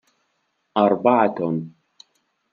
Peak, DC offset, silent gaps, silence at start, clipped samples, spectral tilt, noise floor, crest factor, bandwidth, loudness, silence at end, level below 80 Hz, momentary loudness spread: -2 dBFS; under 0.1%; none; 0.75 s; under 0.1%; -8.5 dB/octave; -71 dBFS; 20 dB; 7 kHz; -20 LUFS; 0.85 s; -74 dBFS; 12 LU